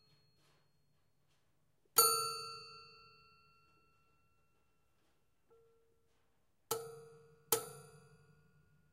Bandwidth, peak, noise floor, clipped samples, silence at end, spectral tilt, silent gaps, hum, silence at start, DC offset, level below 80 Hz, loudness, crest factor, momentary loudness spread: 15.5 kHz; -14 dBFS; -81 dBFS; under 0.1%; 1.1 s; 0 dB/octave; none; none; 1.95 s; under 0.1%; -84 dBFS; -34 LUFS; 32 dB; 26 LU